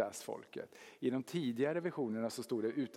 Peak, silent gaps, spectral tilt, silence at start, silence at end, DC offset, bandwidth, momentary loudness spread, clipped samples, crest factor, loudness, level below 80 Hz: -22 dBFS; none; -5.5 dB/octave; 0 s; 0 s; under 0.1%; 16.5 kHz; 12 LU; under 0.1%; 18 dB; -39 LUFS; -88 dBFS